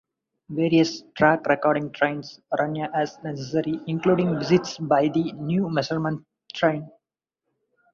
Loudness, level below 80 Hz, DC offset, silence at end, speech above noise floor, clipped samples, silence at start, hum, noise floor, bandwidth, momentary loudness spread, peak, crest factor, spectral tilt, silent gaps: -24 LUFS; -64 dBFS; under 0.1%; 1.05 s; 62 dB; under 0.1%; 0.5 s; none; -85 dBFS; 7.4 kHz; 9 LU; -4 dBFS; 20 dB; -6.5 dB/octave; none